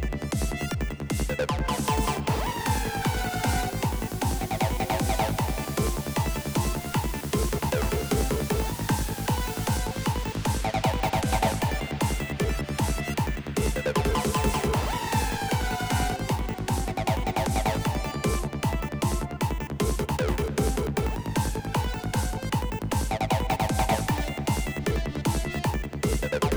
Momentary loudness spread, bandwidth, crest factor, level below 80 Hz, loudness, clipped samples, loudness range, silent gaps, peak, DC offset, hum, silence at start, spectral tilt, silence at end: 4 LU; over 20 kHz; 16 dB; -32 dBFS; -28 LUFS; under 0.1%; 1 LU; none; -12 dBFS; under 0.1%; none; 0 s; -5 dB/octave; 0 s